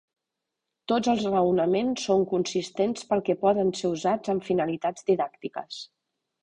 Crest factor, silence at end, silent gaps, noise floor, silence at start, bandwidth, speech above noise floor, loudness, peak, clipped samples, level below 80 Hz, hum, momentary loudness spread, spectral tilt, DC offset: 16 dB; 0.6 s; none; -85 dBFS; 0.9 s; 9.8 kHz; 60 dB; -26 LUFS; -10 dBFS; under 0.1%; -64 dBFS; none; 13 LU; -5.5 dB/octave; under 0.1%